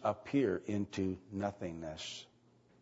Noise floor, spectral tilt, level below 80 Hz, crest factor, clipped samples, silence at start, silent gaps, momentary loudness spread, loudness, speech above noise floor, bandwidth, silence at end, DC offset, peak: -67 dBFS; -5.5 dB/octave; -68 dBFS; 18 dB; under 0.1%; 0 s; none; 11 LU; -38 LUFS; 30 dB; 7.6 kHz; 0.55 s; under 0.1%; -20 dBFS